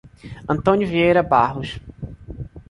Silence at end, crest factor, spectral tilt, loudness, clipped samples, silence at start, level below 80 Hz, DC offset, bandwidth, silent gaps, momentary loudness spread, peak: 0.1 s; 18 dB; -7.5 dB/octave; -18 LUFS; under 0.1%; 0.25 s; -42 dBFS; under 0.1%; 11 kHz; none; 20 LU; -2 dBFS